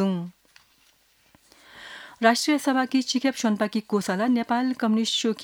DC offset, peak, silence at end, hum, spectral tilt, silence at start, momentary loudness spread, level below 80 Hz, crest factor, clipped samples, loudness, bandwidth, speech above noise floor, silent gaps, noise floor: under 0.1%; -4 dBFS; 0 s; none; -4 dB/octave; 0 s; 19 LU; -72 dBFS; 22 dB; under 0.1%; -24 LUFS; 19 kHz; 38 dB; none; -62 dBFS